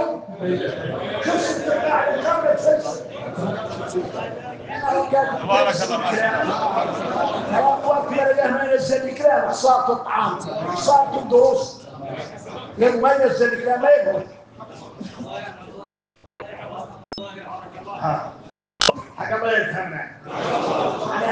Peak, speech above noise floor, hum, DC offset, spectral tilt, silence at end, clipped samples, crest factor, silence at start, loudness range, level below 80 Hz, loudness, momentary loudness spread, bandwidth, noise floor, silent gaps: 0 dBFS; 39 dB; none; under 0.1%; -4 dB/octave; 0 s; under 0.1%; 22 dB; 0 s; 11 LU; -60 dBFS; -20 LUFS; 18 LU; 9.8 kHz; -59 dBFS; none